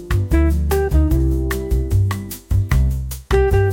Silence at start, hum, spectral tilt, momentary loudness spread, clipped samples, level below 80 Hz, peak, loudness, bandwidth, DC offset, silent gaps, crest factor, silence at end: 0 s; none; -7 dB/octave; 5 LU; under 0.1%; -20 dBFS; -4 dBFS; -19 LUFS; 17 kHz; under 0.1%; none; 12 dB; 0 s